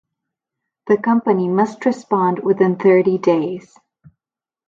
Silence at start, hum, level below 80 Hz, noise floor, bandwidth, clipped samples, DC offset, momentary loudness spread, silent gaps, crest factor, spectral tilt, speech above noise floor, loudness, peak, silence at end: 0.85 s; none; -66 dBFS; under -90 dBFS; 7.6 kHz; under 0.1%; under 0.1%; 8 LU; none; 16 dB; -8 dB/octave; over 74 dB; -17 LUFS; -2 dBFS; 1.05 s